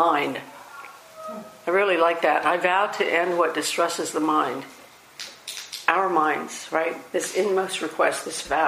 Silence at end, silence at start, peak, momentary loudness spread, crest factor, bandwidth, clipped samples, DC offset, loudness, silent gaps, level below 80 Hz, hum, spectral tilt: 0 s; 0 s; -2 dBFS; 17 LU; 22 dB; 15.5 kHz; under 0.1%; under 0.1%; -23 LUFS; none; -66 dBFS; none; -2.5 dB/octave